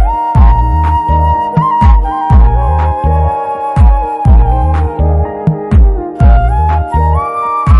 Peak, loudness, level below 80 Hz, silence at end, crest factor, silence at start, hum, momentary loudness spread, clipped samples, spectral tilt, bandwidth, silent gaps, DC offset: 0 dBFS; -11 LUFS; -10 dBFS; 0 s; 8 dB; 0 s; none; 4 LU; 0.1%; -9.5 dB/octave; 3.8 kHz; none; under 0.1%